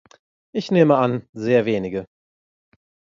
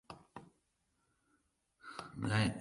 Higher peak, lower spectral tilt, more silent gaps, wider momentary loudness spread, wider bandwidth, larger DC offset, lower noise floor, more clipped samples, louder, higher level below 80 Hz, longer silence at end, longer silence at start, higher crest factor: first, -2 dBFS vs -18 dBFS; first, -7.5 dB/octave vs -5.5 dB/octave; first, 1.29-1.33 s vs none; second, 14 LU vs 23 LU; second, 7.4 kHz vs 11.5 kHz; neither; first, under -90 dBFS vs -81 dBFS; neither; first, -20 LUFS vs -38 LUFS; about the same, -60 dBFS vs -64 dBFS; first, 1.1 s vs 0 s; first, 0.55 s vs 0.1 s; about the same, 20 dB vs 24 dB